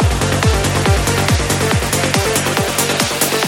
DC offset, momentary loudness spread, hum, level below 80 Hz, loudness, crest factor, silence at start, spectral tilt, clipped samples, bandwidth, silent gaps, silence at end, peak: under 0.1%; 1 LU; none; -24 dBFS; -15 LUFS; 14 dB; 0 s; -4 dB/octave; under 0.1%; 17 kHz; none; 0 s; -2 dBFS